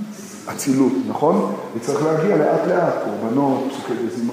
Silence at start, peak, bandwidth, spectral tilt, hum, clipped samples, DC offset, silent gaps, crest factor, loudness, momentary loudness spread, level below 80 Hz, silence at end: 0 s; -4 dBFS; 15.5 kHz; -6 dB/octave; none; under 0.1%; under 0.1%; none; 16 dB; -20 LUFS; 8 LU; -68 dBFS; 0 s